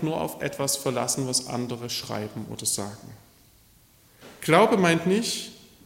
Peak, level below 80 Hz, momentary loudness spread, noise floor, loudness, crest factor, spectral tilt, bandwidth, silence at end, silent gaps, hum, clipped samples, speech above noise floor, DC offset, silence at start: -6 dBFS; -62 dBFS; 14 LU; -57 dBFS; -25 LUFS; 22 dB; -4 dB/octave; 16.5 kHz; 0.25 s; none; none; under 0.1%; 32 dB; under 0.1%; 0 s